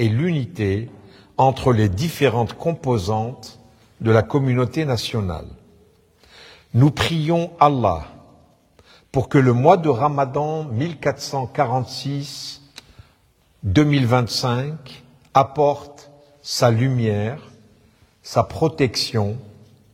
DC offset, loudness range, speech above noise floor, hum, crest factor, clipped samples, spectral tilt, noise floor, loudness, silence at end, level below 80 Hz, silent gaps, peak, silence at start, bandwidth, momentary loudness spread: under 0.1%; 4 LU; 40 dB; none; 20 dB; under 0.1%; -6.5 dB/octave; -59 dBFS; -20 LUFS; 0.45 s; -48 dBFS; none; 0 dBFS; 0 s; 16 kHz; 14 LU